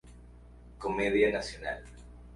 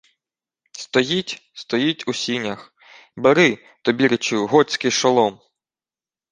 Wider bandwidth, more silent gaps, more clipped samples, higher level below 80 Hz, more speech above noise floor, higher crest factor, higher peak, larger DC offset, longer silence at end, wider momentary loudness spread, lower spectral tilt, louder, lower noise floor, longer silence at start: first, 11.5 kHz vs 10 kHz; neither; neither; first, -50 dBFS vs -64 dBFS; second, 22 dB vs over 71 dB; about the same, 20 dB vs 20 dB; second, -14 dBFS vs -2 dBFS; neither; second, 0 s vs 0.95 s; first, 21 LU vs 14 LU; about the same, -5 dB/octave vs -4 dB/octave; second, -31 LUFS vs -19 LUFS; second, -52 dBFS vs under -90 dBFS; second, 0.05 s vs 0.75 s